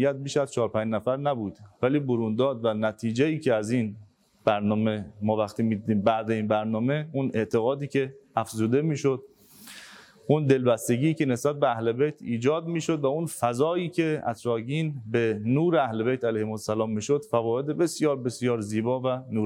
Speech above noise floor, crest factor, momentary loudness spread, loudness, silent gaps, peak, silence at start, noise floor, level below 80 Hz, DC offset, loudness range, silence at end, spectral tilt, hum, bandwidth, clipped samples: 23 dB; 18 dB; 5 LU; -26 LUFS; none; -8 dBFS; 0 s; -49 dBFS; -70 dBFS; under 0.1%; 2 LU; 0 s; -6.5 dB/octave; none; 16.5 kHz; under 0.1%